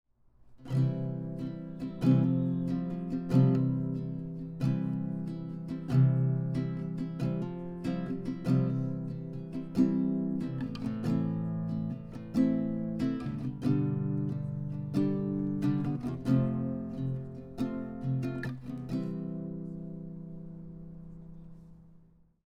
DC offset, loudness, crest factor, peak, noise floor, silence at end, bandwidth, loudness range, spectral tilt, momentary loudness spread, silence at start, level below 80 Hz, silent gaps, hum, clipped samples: under 0.1%; -32 LUFS; 20 dB; -12 dBFS; -60 dBFS; 0.55 s; 7 kHz; 7 LU; -9.5 dB/octave; 13 LU; 0.45 s; -56 dBFS; none; none; under 0.1%